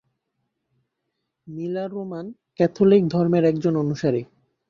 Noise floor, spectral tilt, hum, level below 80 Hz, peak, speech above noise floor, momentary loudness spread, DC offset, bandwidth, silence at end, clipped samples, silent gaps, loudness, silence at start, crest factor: -78 dBFS; -8.5 dB/octave; none; -62 dBFS; -4 dBFS; 58 dB; 16 LU; under 0.1%; 7.2 kHz; 0.45 s; under 0.1%; none; -21 LUFS; 1.45 s; 18 dB